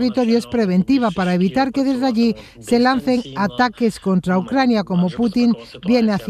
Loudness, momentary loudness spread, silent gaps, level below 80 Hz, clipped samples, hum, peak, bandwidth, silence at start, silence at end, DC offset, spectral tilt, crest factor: -18 LUFS; 4 LU; none; -48 dBFS; under 0.1%; none; -4 dBFS; 13 kHz; 0 s; 0 s; under 0.1%; -6.5 dB/octave; 14 dB